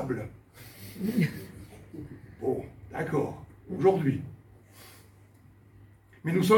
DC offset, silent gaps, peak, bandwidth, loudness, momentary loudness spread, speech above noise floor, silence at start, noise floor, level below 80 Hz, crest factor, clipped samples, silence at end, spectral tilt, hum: under 0.1%; none; -10 dBFS; 17.5 kHz; -30 LUFS; 24 LU; 29 dB; 0 s; -56 dBFS; -58 dBFS; 22 dB; under 0.1%; 0 s; -7 dB/octave; none